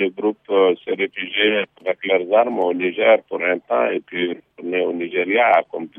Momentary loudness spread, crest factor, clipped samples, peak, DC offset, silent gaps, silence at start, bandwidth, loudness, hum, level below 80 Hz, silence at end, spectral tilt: 8 LU; 16 dB; under 0.1%; -2 dBFS; under 0.1%; none; 0 s; 3.8 kHz; -19 LUFS; none; -74 dBFS; 0.1 s; -7 dB/octave